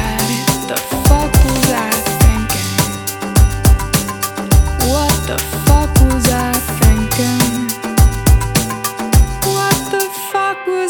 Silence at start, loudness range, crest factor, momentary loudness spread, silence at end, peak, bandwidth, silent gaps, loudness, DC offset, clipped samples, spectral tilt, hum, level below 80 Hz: 0 s; 1 LU; 14 dB; 6 LU; 0 s; 0 dBFS; over 20 kHz; none; -14 LUFS; under 0.1%; under 0.1%; -4.5 dB/octave; none; -16 dBFS